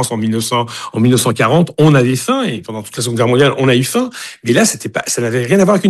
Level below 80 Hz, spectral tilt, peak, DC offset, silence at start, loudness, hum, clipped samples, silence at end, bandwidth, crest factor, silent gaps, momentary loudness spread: -52 dBFS; -5 dB/octave; -2 dBFS; under 0.1%; 0 s; -13 LUFS; none; under 0.1%; 0 s; 13 kHz; 12 dB; none; 9 LU